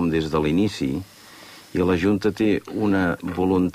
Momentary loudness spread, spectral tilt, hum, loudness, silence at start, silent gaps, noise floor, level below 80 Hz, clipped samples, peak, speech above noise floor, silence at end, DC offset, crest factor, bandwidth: 11 LU; -7 dB/octave; none; -22 LUFS; 0 s; none; -44 dBFS; -46 dBFS; under 0.1%; -8 dBFS; 23 dB; 0 s; under 0.1%; 14 dB; 15.5 kHz